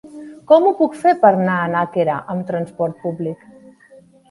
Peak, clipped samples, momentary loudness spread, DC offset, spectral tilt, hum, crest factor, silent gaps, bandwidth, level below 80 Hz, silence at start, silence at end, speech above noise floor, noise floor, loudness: 0 dBFS; under 0.1%; 14 LU; under 0.1%; -8 dB/octave; none; 18 dB; none; 11.5 kHz; -64 dBFS; 0.05 s; 0.95 s; 31 dB; -47 dBFS; -17 LUFS